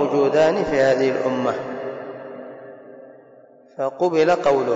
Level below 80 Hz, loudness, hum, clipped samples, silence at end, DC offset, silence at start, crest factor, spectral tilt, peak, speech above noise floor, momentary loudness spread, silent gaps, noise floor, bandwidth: -58 dBFS; -20 LUFS; none; under 0.1%; 0 s; under 0.1%; 0 s; 12 dB; -6 dB/octave; -8 dBFS; 30 dB; 22 LU; none; -49 dBFS; 7.8 kHz